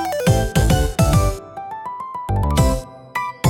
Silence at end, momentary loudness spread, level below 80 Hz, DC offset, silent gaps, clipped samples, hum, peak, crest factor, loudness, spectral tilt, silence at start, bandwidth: 0 s; 13 LU; -24 dBFS; under 0.1%; none; under 0.1%; none; -4 dBFS; 14 dB; -19 LUFS; -5.5 dB/octave; 0 s; 17.5 kHz